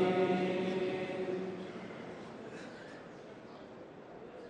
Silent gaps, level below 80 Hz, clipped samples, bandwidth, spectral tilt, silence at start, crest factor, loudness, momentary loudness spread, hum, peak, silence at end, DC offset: none; -74 dBFS; under 0.1%; 9.4 kHz; -7 dB/octave; 0 s; 20 dB; -37 LUFS; 19 LU; none; -18 dBFS; 0 s; under 0.1%